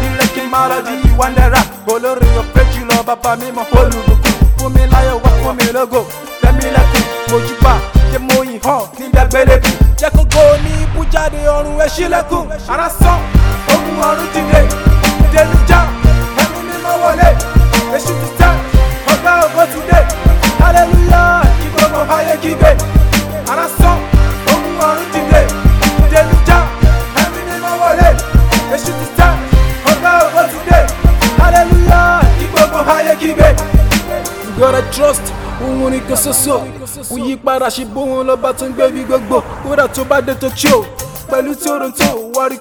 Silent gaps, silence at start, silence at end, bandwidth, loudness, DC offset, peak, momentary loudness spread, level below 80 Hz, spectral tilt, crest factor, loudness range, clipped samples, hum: none; 0 s; 0 s; 19.5 kHz; -11 LUFS; under 0.1%; 0 dBFS; 8 LU; -14 dBFS; -5 dB/octave; 10 dB; 4 LU; 3%; none